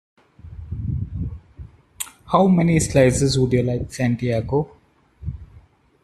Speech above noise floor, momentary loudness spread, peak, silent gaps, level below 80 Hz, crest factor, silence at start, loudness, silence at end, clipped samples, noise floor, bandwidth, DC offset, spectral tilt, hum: 33 dB; 19 LU; -2 dBFS; none; -40 dBFS; 18 dB; 0.45 s; -20 LUFS; 0.6 s; under 0.1%; -51 dBFS; 13.5 kHz; under 0.1%; -6 dB/octave; none